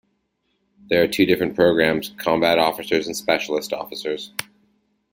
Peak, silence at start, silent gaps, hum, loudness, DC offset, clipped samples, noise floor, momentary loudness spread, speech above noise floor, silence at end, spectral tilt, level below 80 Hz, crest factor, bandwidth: -2 dBFS; 0.9 s; none; none; -20 LUFS; under 0.1%; under 0.1%; -70 dBFS; 11 LU; 50 dB; 0.7 s; -4.5 dB/octave; -56 dBFS; 20 dB; 17 kHz